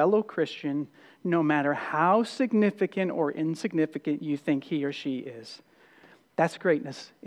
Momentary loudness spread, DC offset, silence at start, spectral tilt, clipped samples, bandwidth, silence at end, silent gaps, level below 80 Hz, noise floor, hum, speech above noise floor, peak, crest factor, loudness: 12 LU; under 0.1%; 0 s; -6.5 dB/octave; under 0.1%; 11.5 kHz; 0 s; none; -86 dBFS; -57 dBFS; none; 30 dB; -10 dBFS; 18 dB; -28 LUFS